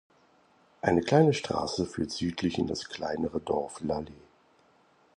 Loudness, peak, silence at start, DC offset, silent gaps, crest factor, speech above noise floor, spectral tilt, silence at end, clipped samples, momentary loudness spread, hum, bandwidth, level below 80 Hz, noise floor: -29 LUFS; -8 dBFS; 0.85 s; under 0.1%; none; 22 dB; 35 dB; -6 dB/octave; 1 s; under 0.1%; 11 LU; none; 11 kHz; -54 dBFS; -64 dBFS